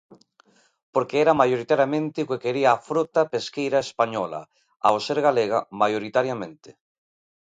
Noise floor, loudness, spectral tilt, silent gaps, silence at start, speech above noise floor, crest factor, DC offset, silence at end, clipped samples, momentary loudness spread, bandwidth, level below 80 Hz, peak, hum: -60 dBFS; -23 LUFS; -5.5 dB/octave; 0.83-0.93 s; 0.1 s; 38 dB; 20 dB; under 0.1%; 0.7 s; under 0.1%; 8 LU; 9.4 kHz; -66 dBFS; -4 dBFS; none